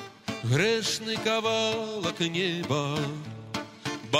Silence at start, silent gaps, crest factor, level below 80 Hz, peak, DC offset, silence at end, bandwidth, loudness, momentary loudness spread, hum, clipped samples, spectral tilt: 0 s; none; 18 dB; -64 dBFS; -10 dBFS; under 0.1%; 0 s; 16 kHz; -28 LUFS; 11 LU; none; under 0.1%; -4 dB/octave